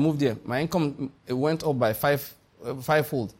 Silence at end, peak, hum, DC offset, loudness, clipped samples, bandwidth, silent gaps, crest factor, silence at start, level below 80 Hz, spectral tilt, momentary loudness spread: 0.1 s; -10 dBFS; none; under 0.1%; -26 LUFS; under 0.1%; 16.5 kHz; none; 16 dB; 0 s; -58 dBFS; -6.5 dB/octave; 12 LU